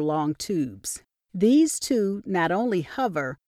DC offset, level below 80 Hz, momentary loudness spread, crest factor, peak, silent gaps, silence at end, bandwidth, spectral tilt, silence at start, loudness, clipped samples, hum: under 0.1%; -62 dBFS; 14 LU; 14 dB; -10 dBFS; none; 0.1 s; 15.5 kHz; -5 dB/octave; 0 s; -24 LUFS; under 0.1%; none